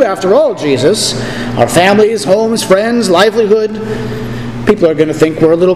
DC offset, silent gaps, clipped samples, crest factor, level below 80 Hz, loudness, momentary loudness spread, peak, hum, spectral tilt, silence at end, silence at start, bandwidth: 1%; none; 0.7%; 10 dB; -38 dBFS; -10 LUFS; 10 LU; 0 dBFS; none; -5 dB/octave; 0 s; 0 s; 15 kHz